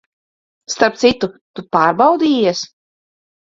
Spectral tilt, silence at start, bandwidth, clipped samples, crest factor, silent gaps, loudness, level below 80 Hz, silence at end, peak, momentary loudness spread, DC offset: -4 dB/octave; 0.7 s; 7.8 kHz; under 0.1%; 18 dB; 1.41-1.54 s; -15 LUFS; -54 dBFS; 0.95 s; 0 dBFS; 14 LU; under 0.1%